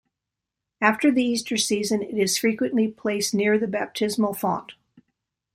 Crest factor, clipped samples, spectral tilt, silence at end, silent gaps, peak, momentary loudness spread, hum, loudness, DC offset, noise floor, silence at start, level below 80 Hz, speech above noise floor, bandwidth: 22 dB; under 0.1%; -3.5 dB/octave; 0.85 s; none; -2 dBFS; 5 LU; none; -23 LUFS; under 0.1%; -85 dBFS; 0.8 s; -66 dBFS; 62 dB; 16.5 kHz